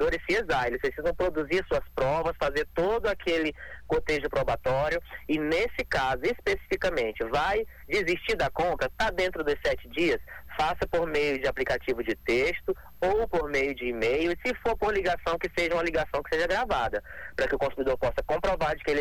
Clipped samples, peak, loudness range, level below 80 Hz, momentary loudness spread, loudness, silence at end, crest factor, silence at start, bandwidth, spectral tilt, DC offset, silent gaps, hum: under 0.1%; -16 dBFS; 1 LU; -44 dBFS; 4 LU; -28 LUFS; 0 s; 12 dB; 0 s; 19 kHz; -5 dB/octave; under 0.1%; none; none